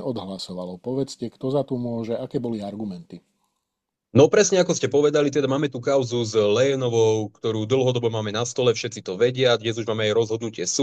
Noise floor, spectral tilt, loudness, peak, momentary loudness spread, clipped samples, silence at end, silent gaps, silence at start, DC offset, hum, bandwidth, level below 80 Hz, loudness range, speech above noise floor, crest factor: -82 dBFS; -5 dB/octave; -22 LUFS; -4 dBFS; 11 LU; under 0.1%; 0 s; none; 0 s; under 0.1%; none; 9.4 kHz; -64 dBFS; 9 LU; 60 dB; 20 dB